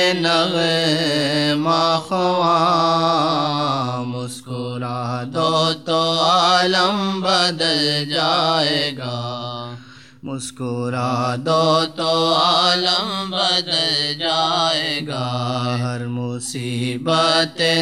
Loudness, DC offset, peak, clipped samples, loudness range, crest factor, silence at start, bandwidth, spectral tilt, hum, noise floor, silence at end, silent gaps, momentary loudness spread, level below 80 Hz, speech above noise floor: -18 LUFS; 0.2%; -2 dBFS; under 0.1%; 4 LU; 16 dB; 0 s; 14.5 kHz; -4 dB/octave; none; -40 dBFS; 0 s; none; 11 LU; -66 dBFS; 22 dB